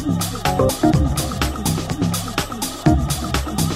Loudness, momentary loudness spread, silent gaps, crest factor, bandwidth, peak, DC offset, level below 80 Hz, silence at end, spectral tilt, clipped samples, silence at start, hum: -20 LUFS; 5 LU; none; 18 dB; 16 kHz; -2 dBFS; under 0.1%; -28 dBFS; 0 s; -5 dB/octave; under 0.1%; 0 s; none